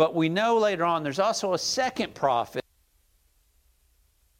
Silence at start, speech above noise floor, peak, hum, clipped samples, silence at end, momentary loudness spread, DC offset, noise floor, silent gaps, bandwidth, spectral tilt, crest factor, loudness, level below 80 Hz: 0 s; 41 dB; -8 dBFS; none; under 0.1%; 1.8 s; 5 LU; under 0.1%; -66 dBFS; none; 16.5 kHz; -4 dB/octave; 20 dB; -25 LUFS; -64 dBFS